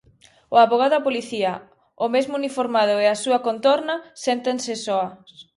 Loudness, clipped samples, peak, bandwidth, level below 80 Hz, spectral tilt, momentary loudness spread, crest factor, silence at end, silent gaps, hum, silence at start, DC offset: -21 LUFS; under 0.1%; -4 dBFS; 11.5 kHz; -70 dBFS; -3.5 dB/octave; 9 LU; 18 dB; 0.15 s; none; none; 0.5 s; under 0.1%